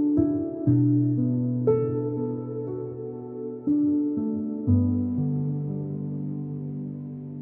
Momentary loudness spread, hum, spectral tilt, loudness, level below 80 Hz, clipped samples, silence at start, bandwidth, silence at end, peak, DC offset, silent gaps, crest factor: 12 LU; none; -15 dB/octave; -26 LUFS; -56 dBFS; under 0.1%; 0 s; 2.4 kHz; 0 s; -10 dBFS; under 0.1%; none; 14 dB